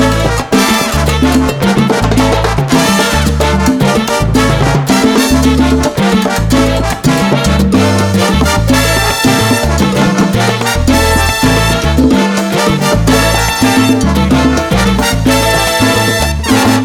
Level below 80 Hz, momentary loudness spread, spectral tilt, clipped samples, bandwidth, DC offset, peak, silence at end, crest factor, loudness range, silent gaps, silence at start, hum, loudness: -20 dBFS; 2 LU; -4.5 dB/octave; under 0.1%; 18 kHz; under 0.1%; 0 dBFS; 0 s; 10 dB; 1 LU; none; 0 s; none; -10 LUFS